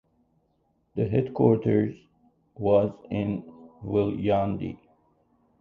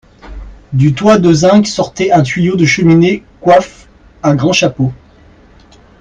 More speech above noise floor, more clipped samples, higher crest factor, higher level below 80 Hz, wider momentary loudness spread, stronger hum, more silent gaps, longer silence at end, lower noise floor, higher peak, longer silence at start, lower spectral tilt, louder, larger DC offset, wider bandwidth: first, 45 dB vs 32 dB; neither; first, 22 dB vs 12 dB; second, -54 dBFS vs -38 dBFS; first, 14 LU vs 9 LU; neither; neither; second, 0.85 s vs 1.05 s; first, -70 dBFS vs -42 dBFS; second, -6 dBFS vs 0 dBFS; first, 0.95 s vs 0.25 s; first, -10.5 dB/octave vs -6 dB/octave; second, -26 LUFS vs -10 LUFS; neither; second, 4.6 kHz vs 9.6 kHz